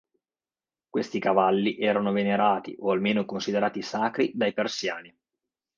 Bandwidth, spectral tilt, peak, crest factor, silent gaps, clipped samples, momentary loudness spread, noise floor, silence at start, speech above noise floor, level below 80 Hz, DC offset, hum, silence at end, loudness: 7.4 kHz; -5.5 dB/octave; -8 dBFS; 20 dB; none; under 0.1%; 8 LU; under -90 dBFS; 0.95 s; over 65 dB; -72 dBFS; under 0.1%; none; 0.7 s; -26 LUFS